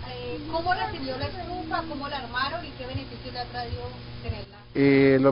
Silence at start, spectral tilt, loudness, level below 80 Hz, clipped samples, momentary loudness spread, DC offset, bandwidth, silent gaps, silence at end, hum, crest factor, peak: 0 s; -10.5 dB/octave; -28 LUFS; -44 dBFS; under 0.1%; 16 LU; under 0.1%; 5.4 kHz; none; 0 s; 60 Hz at -45 dBFS; 20 dB; -8 dBFS